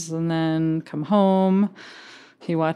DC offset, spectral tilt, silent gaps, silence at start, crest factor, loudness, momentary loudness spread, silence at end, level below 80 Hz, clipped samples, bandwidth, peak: under 0.1%; -7 dB/octave; none; 0 s; 16 dB; -22 LUFS; 22 LU; 0 s; -72 dBFS; under 0.1%; 10.5 kHz; -6 dBFS